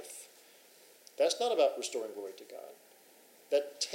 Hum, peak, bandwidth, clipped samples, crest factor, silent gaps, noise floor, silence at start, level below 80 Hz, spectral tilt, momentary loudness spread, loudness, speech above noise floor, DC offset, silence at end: none; -16 dBFS; 16 kHz; under 0.1%; 20 dB; none; -61 dBFS; 0 s; under -90 dBFS; 0 dB/octave; 22 LU; -33 LUFS; 27 dB; under 0.1%; 0 s